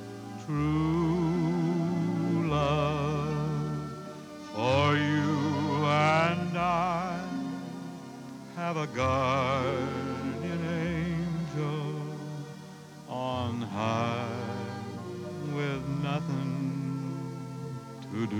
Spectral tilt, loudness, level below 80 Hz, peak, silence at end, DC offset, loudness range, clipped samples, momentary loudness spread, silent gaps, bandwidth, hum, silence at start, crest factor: -7 dB/octave; -30 LUFS; -54 dBFS; -12 dBFS; 0 s; under 0.1%; 7 LU; under 0.1%; 13 LU; none; 12.5 kHz; none; 0 s; 18 dB